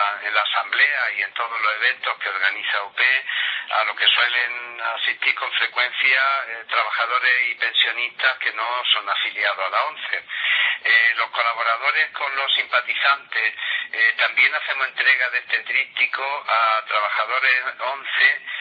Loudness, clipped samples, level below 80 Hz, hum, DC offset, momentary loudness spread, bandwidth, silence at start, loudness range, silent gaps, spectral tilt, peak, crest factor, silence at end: -19 LUFS; under 0.1%; -84 dBFS; none; under 0.1%; 7 LU; 5.4 kHz; 0 s; 1 LU; none; 0 dB/octave; -2 dBFS; 20 dB; 0 s